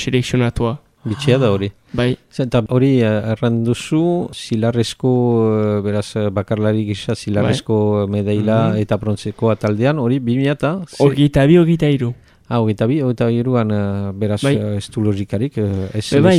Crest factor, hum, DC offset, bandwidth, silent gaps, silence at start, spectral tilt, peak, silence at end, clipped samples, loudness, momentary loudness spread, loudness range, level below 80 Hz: 16 dB; none; under 0.1%; 12 kHz; none; 0 s; -7 dB/octave; 0 dBFS; 0 s; under 0.1%; -17 LUFS; 7 LU; 3 LU; -44 dBFS